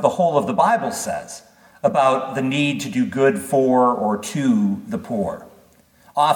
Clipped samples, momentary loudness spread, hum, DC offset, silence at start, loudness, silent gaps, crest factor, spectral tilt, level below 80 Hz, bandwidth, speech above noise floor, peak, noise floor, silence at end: under 0.1%; 11 LU; none; under 0.1%; 0 s; -20 LUFS; none; 18 dB; -5.5 dB/octave; -62 dBFS; 19 kHz; 34 dB; -2 dBFS; -53 dBFS; 0 s